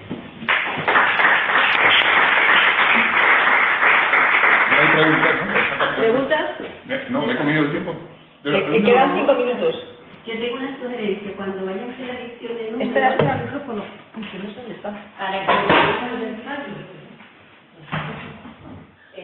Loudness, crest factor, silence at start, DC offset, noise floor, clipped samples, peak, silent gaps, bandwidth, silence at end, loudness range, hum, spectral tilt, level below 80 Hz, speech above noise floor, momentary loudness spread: -17 LUFS; 18 dB; 0 s; under 0.1%; -48 dBFS; under 0.1%; -2 dBFS; none; 5.4 kHz; 0 s; 11 LU; none; -7.5 dB/octave; -58 dBFS; 27 dB; 19 LU